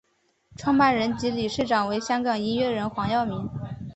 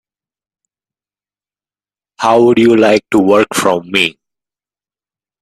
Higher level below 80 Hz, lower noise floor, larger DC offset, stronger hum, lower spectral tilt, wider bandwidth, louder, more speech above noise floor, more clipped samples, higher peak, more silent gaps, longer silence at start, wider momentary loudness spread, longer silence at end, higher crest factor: about the same, -52 dBFS vs -56 dBFS; second, -62 dBFS vs under -90 dBFS; neither; second, none vs 50 Hz at -45 dBFS; about the same, -5.5 dB/octave vs -4.5 dB/octave; second, 8.2 kHz vs 14.5 kHz; second, -25 LUFS vs -11 LUFS; second, 38 dB vs over 80 dB; neither; second, -6 dBFS vs 0 dBFS; neither; second, 0.6 s vs 2.2 s; first, 10 LU vs 5 LU; second, 0 s vs 1.3 s; first, 20 dB vs 14 dB